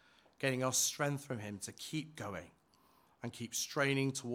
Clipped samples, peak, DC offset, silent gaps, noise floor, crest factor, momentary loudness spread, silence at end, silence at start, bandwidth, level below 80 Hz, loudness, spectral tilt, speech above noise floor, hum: under 0.1%; -18 dBFS; under 0.1%; none; -70 dBFS; 20 dB; 13 LU; 0 s; 0.4 s; 18 kHz; -78 dBFS; -37 LUFS; -3.5 dB/octave; 32 dB; none